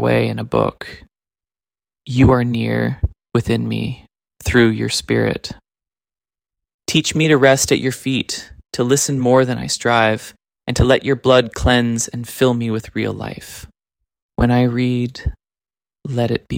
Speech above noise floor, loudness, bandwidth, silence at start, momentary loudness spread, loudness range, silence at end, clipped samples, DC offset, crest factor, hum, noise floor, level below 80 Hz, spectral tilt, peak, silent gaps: over 73 dB; -17 LUFS; 16.5 kHz; 0 s; 15 LU; 5 LU; 0 s; under 0.1%; under 0.1%; 16 dB; none; under -90 dBFS; -34 dBFS; -5 dB/octave; -2 dBFS; 6.74-6.79 s, 14.22-14.29 s